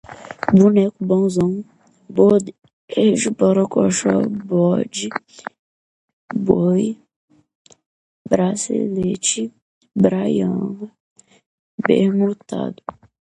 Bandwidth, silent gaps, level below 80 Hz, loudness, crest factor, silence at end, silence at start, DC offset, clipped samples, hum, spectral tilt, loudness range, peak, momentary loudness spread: 11 kHz; 2.73-2.88 s, 5.59-6.28 s, 7.16-7.28 s, 7.55-7.65 s, 7.86-8.25 s, 9.62-9.81 s, 11.00-11.16 s, 11.46-11.78 s; -56 dBFS; -18 LUFS; 18 dB; 0.45 s; 0.1 s; under 0.1%; under 0.1%; none; -6 dB/octave; 5 LU; 0 dBFS; 18 LU